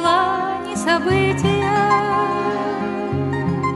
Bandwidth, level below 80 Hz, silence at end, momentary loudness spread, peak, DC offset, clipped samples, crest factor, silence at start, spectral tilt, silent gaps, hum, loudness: 11.5 kHz; -46 dBFS; 0 s; 6 LU; -4 dBFS; under 0.1%; under 0.1%; 14 dB; 0 s; -5.5 dB/octave; none; none; -19 LUFS